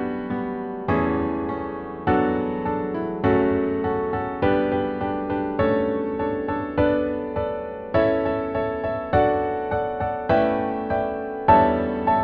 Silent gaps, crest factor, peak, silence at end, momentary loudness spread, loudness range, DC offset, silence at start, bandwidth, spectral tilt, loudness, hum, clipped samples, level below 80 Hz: none; 20 dB; -4 dBFS; 0 s; 7 LU; 2 LU; under 0.1%; 0 s; 5.2 kHz; -10 dB/octave; -23 LUFS; none; under 0.1%; -44 dBFS